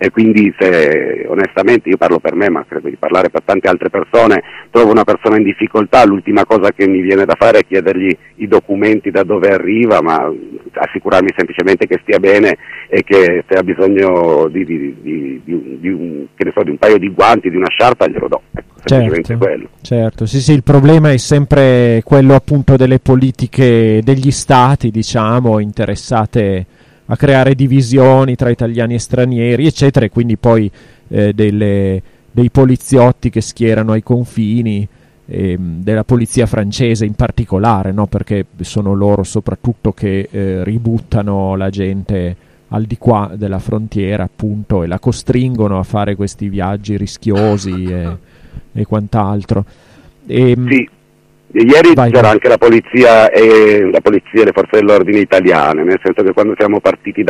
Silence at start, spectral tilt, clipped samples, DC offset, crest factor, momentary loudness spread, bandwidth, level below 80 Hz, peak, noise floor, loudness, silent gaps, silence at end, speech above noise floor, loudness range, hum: 0 s; -7 dB/octave; 0.1%; under 0.1%; 10 dB; 11 LU; 12 kHz; -36 dBFS; 0 dBFS; -49 dBFS; -11 LUFS; none; 0 s; 38 dB; 8 LU; none